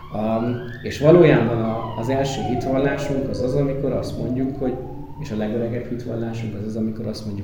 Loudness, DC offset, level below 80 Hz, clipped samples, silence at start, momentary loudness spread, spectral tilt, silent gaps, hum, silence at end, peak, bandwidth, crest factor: -22 LUFS; under 0.1%; -40 dBFS; under 0.1%; 0 s; 13 LU; -7.5 dB/octave; none; none; 0 s; 0 dBFS; 18 kHz; 20 dB